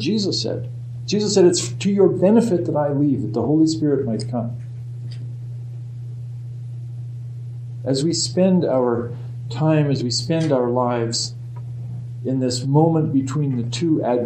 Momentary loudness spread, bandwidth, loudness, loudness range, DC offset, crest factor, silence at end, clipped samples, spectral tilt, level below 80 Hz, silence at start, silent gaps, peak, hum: 16 LU; 9.8 kHz; -20 LUFS; 10 LU; under 0.1%; 18 dB; 0 s; under 0.1%; -6 dB/octave; -56 dBFS; 0 s; none; -4 dBFS; none